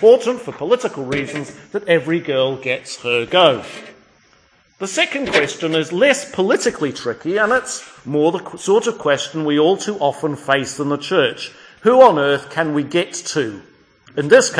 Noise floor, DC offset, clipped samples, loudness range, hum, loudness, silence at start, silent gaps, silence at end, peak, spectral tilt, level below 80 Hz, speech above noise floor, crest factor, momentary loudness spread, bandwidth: -55 dBFS; under 0.1%; under 0.1%; 3 LU; none; -17 LUFS; 0 s; none; 0 s; 0 dBFS; -4 dB/octave; -58 dBFS; 38 dB; 18 dB; 13 LU; 10.5 kHz